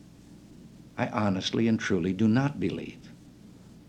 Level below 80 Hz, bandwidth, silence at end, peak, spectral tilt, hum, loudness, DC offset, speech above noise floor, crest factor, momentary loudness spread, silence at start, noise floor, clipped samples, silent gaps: -60 dBFS; 9 kHz; 0.1 s; -10 dBFS; -6.5 dB/octave; none; -28 LUFS; under 0.1%; 24 dB; 18 dB; 17 LU; 0.05 s; -51 dBFS; under 0.1%; none